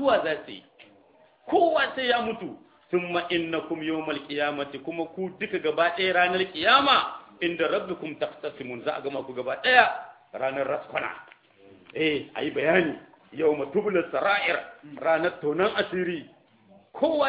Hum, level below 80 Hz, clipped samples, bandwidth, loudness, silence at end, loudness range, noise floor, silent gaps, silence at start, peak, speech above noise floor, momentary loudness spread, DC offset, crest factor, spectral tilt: none; -66 dBFS; under 0.1%; 5.2 kHz; -26 LUFS; 0 s; 4 LU; -58 dBFS; none; 0 s; -2 dBFS; 33 dB; 14 LU; under 0.1%; 26 dB; -7 dB/octave